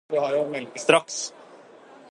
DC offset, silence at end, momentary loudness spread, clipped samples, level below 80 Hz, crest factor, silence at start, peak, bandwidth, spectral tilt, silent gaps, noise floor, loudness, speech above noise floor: under 0.1%; 0.15 s; 11 LU; under 0.1%; -74 dBFS; 24 dB; 0.1 s; -2 dBFS; 11.5 kHz; -2.5 dB/octave; none; -49 dBFS; -24 LUFS; 25 dB